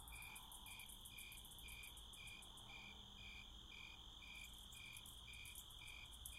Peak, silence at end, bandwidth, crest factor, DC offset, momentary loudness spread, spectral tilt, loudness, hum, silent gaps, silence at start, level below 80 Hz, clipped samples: -38 dBFS; 0 s; 16 kHz; 20 dB; under 0.1%; 2 LU; -1 dB/octave; -56 LUFS; none; none; 0 s; -66 dBFS; under 0.1%